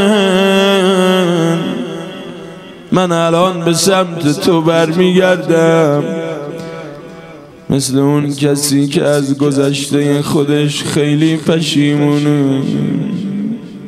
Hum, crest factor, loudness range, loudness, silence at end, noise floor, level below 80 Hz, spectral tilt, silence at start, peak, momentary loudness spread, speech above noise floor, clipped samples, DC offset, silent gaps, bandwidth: none; 12 dB; 3 LU; -12 LUFS; 0 s; -34 dBFS; -52 dBFS; -5.5 dB/octave; 0 s; 0 dBFS; 15 LU; 22 dB; under 0.1%; under 0.1%; none; 15 kHz